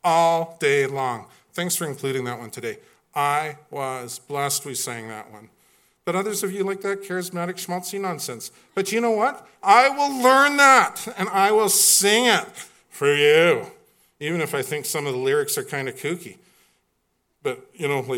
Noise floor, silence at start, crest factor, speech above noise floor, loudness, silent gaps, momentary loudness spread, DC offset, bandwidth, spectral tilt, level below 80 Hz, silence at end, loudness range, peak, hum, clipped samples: -71 dBFS; 0.05 s; 22 dB; 50 dB; -21 LUFS; none; 17 LU; under 0.1%; 17.5 kHz; -2.5 dB/octave; -76 dBFS; 0 s; 11 LU; 0 dBFS; none; under 0.1%